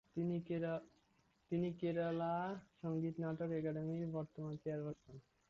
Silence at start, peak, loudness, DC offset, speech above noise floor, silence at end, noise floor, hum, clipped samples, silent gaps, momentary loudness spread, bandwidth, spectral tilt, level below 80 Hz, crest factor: 0.15 s; -30 dBFS; -43 LUFS; under 0.1%; 35 dB; 0.3 s; -77 dBFS; none; under 0.1%; none; 8 LU; 6.8 kHz; -8 dB/octave; -74 dBFS; 12 dB